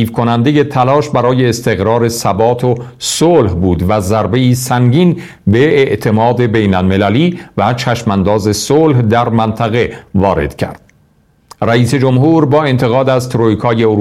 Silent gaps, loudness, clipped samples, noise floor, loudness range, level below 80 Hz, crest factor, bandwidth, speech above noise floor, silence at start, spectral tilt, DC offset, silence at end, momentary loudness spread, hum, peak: none; -11 LUFS; under 0.1%; -51 dBFS; 2 LU; -38 dBFS; 10 dB; 15 kHz; 40 dB; 0 s; -6 dB/octave; under 0.1%; 0 s; 5 LU; none; 0 dBFS